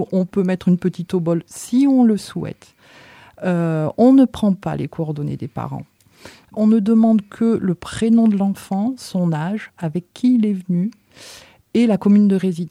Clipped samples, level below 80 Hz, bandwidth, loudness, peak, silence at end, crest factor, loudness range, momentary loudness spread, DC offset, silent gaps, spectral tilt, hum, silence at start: under 0.1%; -54 dBFS; 13.5 kHz; -18 LUFS; -4 dBFS; 0 s; 14 dB; 3 LU; 13 LU; under 0.1%; none; -8 dB/octave; none; 0 s